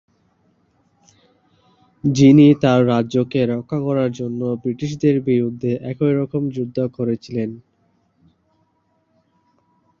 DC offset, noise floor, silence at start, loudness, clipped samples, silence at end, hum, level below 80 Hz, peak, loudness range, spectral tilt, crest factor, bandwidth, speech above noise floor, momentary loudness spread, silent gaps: under 0.1%; -65 dBFS; 2.05 s; -18 LUFS; under 0.1%; 2.4 s; none; -56 dBFS; -2 dBFS; 11 LU; -8 dB/octave; 18 dB; 7.2 kHz; 48 dB; 13 LU; none